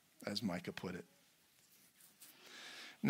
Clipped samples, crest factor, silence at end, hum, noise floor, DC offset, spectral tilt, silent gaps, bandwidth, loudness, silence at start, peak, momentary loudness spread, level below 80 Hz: under 0.1%; 30 dB; 0 s; none; -71 dBFS; under 0.1%; -5 dB/octave; none; 16 kHz; -46 LUFS; 0.2 s; -16 dBFS; 24 LU; -82 dBFS